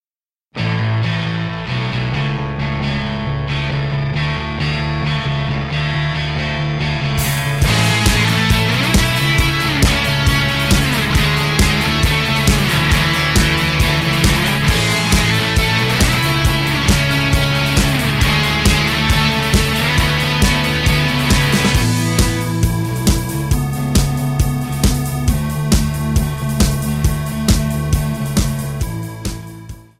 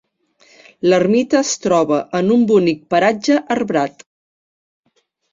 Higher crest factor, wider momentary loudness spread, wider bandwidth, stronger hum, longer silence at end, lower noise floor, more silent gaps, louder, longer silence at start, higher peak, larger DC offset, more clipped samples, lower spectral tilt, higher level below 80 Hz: about the same, 14 dB vs 16 dB; about the same, 6 LU vs 6 LU; first, 16.5 kHz vs 7.8 kHz; neither; second, 0.2 s vs 1.4 s; first, under -90 dBFS vs -54 dBFS; neither; about the same, -16 LUFS vs -16 LUFS; second, 0.55 s vs 0.85 s; about the same, -2 dBFS vs -2 dBFS; neither; neither; about the same, -4.5 dB/octave vs -5 dB/octave; first, -24 dBFS vs -60 dBFS